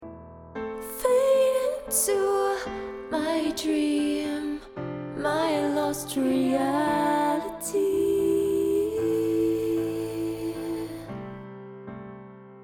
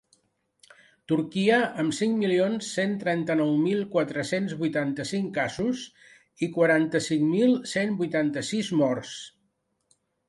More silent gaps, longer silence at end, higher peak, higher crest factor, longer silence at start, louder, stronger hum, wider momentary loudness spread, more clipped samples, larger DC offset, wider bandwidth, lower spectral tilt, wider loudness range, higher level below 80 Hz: neither; second, 0 s vs 1 s; about the same, -10 dBFS vs -10 dBFS; about the same, 16 dB vs 16 dB; second, 0 s vs 1.1 s; about the same, -26 LUFS vs -26 LUFS; neither; first, 17 LU vs 7 LU; neither; neither; first, 20 kHz vs 11.5 kHz; about the same, -4.5 dB/octave vs -5.5 dB/octave; about the same, 3 LU vs 2 LU; first, -56 dBFS vs -68 dBFS